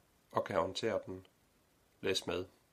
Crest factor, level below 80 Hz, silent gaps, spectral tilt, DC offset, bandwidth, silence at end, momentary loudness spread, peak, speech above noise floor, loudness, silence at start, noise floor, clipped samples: 22 dB; -72 dBFS; none; -4 dB/octave; under 0.1%; 15 kHz; 0.25 s; 9 LU; -16 dBFS; 34 dB; -38 LUFS; 0.35 s; -72 dBFS; under 0.1%